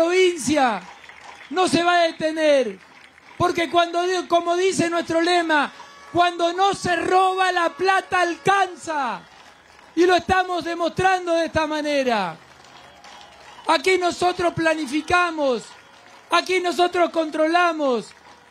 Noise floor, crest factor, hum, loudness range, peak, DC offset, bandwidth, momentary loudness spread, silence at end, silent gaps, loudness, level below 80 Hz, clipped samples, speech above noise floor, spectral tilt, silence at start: -48 dBFS; 16 dB; none; 3 LU; -6 dBFS; under 0.1%; 13.5 kHz; 9 LU; 0.4 s; none; -20 LUFS; -56 dBFS; under 0.1%; 28 dB; -3.5 dB/octave; 0 s